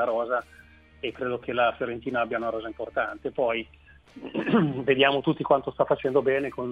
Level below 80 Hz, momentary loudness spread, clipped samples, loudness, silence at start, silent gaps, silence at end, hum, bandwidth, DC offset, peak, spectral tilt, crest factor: -58 dBFS; 11 LU; under 0.1%; -26 LUFS; 0 s; none; 0 s; none; 5.2 kHz; under 0.1%; -6 dBFS; -7.5 dB/octave; 20 dB